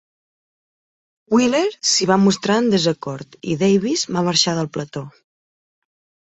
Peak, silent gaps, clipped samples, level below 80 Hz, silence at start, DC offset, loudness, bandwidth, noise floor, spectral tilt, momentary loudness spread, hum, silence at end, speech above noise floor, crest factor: -2 dBFS; none; under 0.1%; -60 dBFS; 1.3 s; under 0.1%; -18 LUFS; 8.2 kHz; under -90 dBFS; -4 dB/octave; 13 LU; none; 1.2 s; over 72 dB; 18 dB